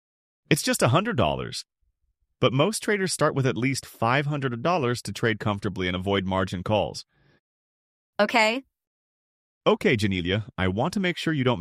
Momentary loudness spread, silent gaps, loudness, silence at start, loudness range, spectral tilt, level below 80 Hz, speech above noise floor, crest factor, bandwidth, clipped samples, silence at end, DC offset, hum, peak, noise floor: 6 LU; 7.40-8.13 s, 8.87-9.61 s; -25 LUFS; 0.5 s; 3 LU; -5 dB/octave; -54 dBFS; 49 dB; 20 dB; 15.5 kHz; under 0.1%; 0 s; under 0.1%; none; -6 dBFS; -74 dBFS